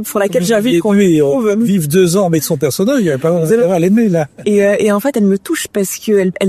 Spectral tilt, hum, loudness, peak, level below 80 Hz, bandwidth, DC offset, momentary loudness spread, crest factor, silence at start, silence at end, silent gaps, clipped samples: -5.5 dB/octave; none; -13 LUFS; 0 dBFS; -52 dBFS; 14 kHz; under 0.1%; 5 LU; 12 dB; 0 s; 0 s; none; under 0.1%